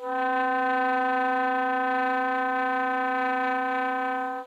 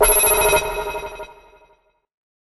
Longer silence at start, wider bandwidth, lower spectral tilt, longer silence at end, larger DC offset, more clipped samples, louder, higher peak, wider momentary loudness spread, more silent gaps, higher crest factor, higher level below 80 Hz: about the same, 0 s vs 0 s; about the same, 12.5 kHz vs 13 kHz; first, -3.5 dB/octave vs -1 dB/octave; second, 0 s vs 1.15 s; neither; neither; second, -25 LUFS vs -17 LUFS; second, -16 dBFS vs -2 dBFS; second, 2 LU vs 23 LU; neither; second, 10 dB vs 20 dB; second, -90 dBFS vs -36 dBFS